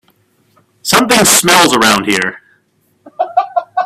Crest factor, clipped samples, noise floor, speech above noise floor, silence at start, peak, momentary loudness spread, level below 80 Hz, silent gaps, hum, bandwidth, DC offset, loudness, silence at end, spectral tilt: 14 dB; 0.1%; -57 dBFS; 48 dB; 0.85 s; 0 dBFS; 13 LU; -48 dBFS; none; none; over 20 kHz; under 0.1%; -10 LUFS; 0 s; -2 dB/octave